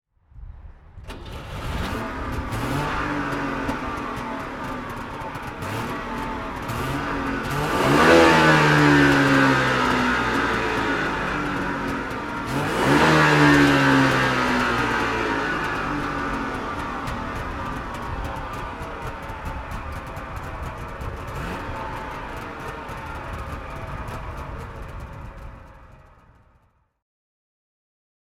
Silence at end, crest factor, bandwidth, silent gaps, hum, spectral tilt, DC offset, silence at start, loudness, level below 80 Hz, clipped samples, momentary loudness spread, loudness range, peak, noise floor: 2.3 s; 22 dB; 16 kHz; none; none; -5.5 dB/octave; under 0.1%; 0.35 s; -22 LUFS; -38 dBFS; under 0.1%; 18 LU; 17 LU; -2 dBFS; -62 dBFS